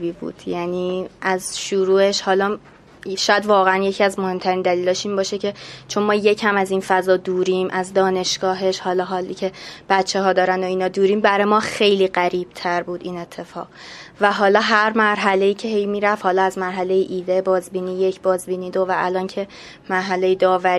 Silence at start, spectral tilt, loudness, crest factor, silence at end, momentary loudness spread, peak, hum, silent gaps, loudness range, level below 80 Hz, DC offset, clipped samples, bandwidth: 0 s; -4 dB/octave; -19 LUFS; 18 dB; 0 s; 12 LU; 0 dBFS; none; none; 3 LU; -60 dBFS; under 0.1%; under 0.1%; 13.5 kHz